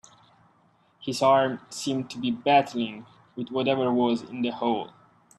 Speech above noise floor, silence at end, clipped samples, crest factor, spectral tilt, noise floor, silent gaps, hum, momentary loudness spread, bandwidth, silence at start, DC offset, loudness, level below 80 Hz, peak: 38 dB; 0.5 s; under 0.1%; 20 dB; -5 dB/octave; -63 dBFS; none; none; 16 LU; 13 kHz; 1 s; under 0.1%; -26 LUFS; -70 dBFS; -8 dBFS